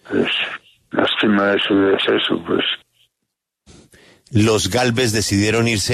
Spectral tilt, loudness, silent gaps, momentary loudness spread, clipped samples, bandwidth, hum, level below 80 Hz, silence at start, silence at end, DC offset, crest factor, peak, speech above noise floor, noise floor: -4 dB/octave; -17 LUFS; none; 7 LU; under 0.1%; 13.5 kHz; none; -50 dBFS; 0.05 s; 0 s; under 0.1%; 16 dB; -2 dBFS; 61 dB; -78 dBFS